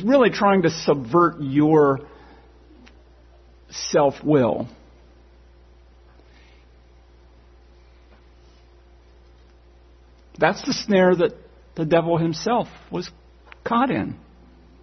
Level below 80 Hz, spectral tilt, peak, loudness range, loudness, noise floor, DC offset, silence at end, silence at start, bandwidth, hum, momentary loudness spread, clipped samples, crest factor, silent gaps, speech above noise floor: -52 dBFS; -6 dB/octave; -2 dBFS; 6 LU; -20 LUFS; -51 dBFS; under 0.1%; 0.65 s; 0 s; 6.4 kHz; none; 15 LU; under 0.1%; 22 dB; none; 31 dB